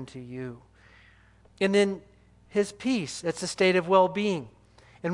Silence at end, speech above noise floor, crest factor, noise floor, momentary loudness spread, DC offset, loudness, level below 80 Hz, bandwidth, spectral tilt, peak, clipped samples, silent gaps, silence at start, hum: 0 s; 31 dB; 20 dB; -57 dBFS; 17 LU; under 0.1%; -26 LUFS; -62 dBFS; 11.5 kHz; -5 dB/octave; -8 dBFS; under 0.1%; none; 0 s; 60 Hz at -55 dBFS